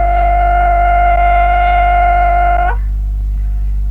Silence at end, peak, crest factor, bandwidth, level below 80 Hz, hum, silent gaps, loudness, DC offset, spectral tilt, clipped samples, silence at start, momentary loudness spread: 0 s; -2 dBFS; 10 dB; 3.8 kHz; -14 dBFS; 50 Hz at -15 dBFS; none; -12 LUFS; under 0.1%; -7.5 dB/octave; under 0.1%; 0 s; 9 LU